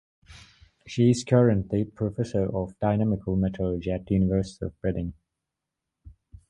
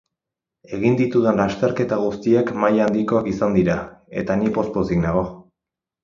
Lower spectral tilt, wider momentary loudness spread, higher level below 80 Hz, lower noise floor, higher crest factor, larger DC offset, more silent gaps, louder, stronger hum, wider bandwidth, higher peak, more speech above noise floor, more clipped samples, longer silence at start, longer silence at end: about the same, -7.5 dB/octave vs -8 dB/octave; first, 10 LU vs 7 LU; about the same, -44 dBFS vs -46 dBFS; about the same, -85 dBFS vs -86 dBFS; about the same, 20 dB vs 18 dB; neither; neither; second, -26 LUFS vs -20 LUFS; neither; first, 11 kHz vs 7.4 kHz; second, -6 dBFS vs -2 dBFS; second, 61 dB vs 67 dB; neither; second, 0.3 s vs 0.7 s; second, 0.4 s vs 0.65 s